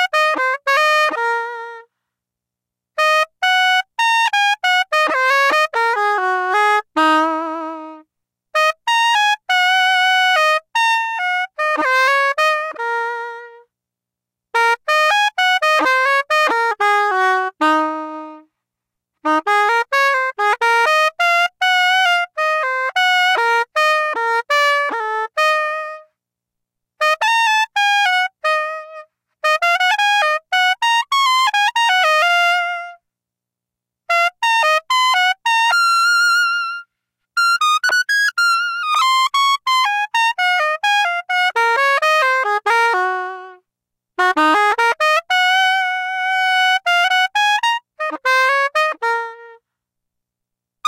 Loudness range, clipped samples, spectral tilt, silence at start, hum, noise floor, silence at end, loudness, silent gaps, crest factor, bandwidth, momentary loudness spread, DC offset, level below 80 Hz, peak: 3 LU; under 0.1%; 1.5 dB/octave; 0 s; 60 Hz at -85 dBFS; -85 dBFS; 0 s; -15 LUFS; none; 10 dB; 16 kHz; 8 LU; under 0.1%; -72 dBFS; -6 dBFS